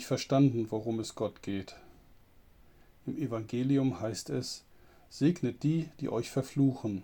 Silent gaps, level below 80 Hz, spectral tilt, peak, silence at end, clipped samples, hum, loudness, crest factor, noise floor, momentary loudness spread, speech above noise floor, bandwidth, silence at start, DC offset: none; -64 dBFS; -6.5 dB/octave; -14 dBFS; 0 s; under 0.1%; none; -32 LUFS; 18 dB; -59 dBFS; 13 LU; 28 dB; 19 kHz; 0 s; under 0.1%